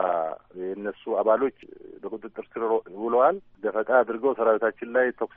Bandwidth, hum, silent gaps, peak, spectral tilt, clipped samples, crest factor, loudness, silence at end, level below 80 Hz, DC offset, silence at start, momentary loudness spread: 3.7 kHz; none; none; -6 dBFS; -4 dB/octave; under 0.1%; 18 dB; -25 LUFS; 0.1 s; -68 dBFS; under 0.1%; 0 s; 15 LU